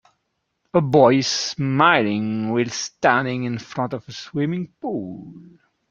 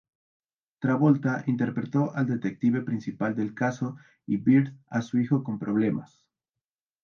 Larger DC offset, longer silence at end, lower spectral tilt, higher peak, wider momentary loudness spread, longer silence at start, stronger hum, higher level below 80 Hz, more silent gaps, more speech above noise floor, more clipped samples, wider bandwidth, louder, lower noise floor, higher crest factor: neither; second, 0.5 s vs 1 s; second, -5 dB/octave vs -8.5 dB/octave; first, -2 dBFS vs -10 dBFS; first, 14 LU vs 10 LU; about the same, 0.75 s vs 0.8 s; neither; first, -60 dBFS vs -70 dBFS; neither; second, 54 dB vs over 64 dB; neither; about the same, 7.6 kHz vs 7 kHz; first, -20 LUFS vs -27 LUFS; second, -74 dBFS vs under -90 dBFS; about the same, 20 dB vs 18 dB